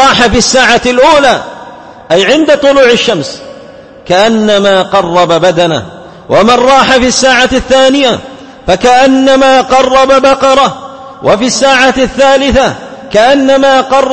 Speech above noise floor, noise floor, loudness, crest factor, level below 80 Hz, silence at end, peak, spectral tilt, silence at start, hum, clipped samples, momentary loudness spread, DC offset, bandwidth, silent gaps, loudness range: 25 dB; -30 dBFS; -6 LUFS; 6 dB; -32 dBFS; 0 s; 0 dBFS; -3.5 dB/octave; 0 s; none; 2%; 9 LU; under 0.1%; 11 kHz; none; 3 LU